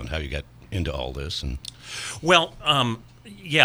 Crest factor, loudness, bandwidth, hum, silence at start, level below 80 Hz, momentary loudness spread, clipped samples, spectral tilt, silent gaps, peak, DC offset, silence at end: 24 dB; -24 LUFS; over 20 kHz; none; 0 s; -38 dBFS; 16 LU; under 0.1%; -4 dB/octave; none; 0 dBFS; under 0.1%; 0 s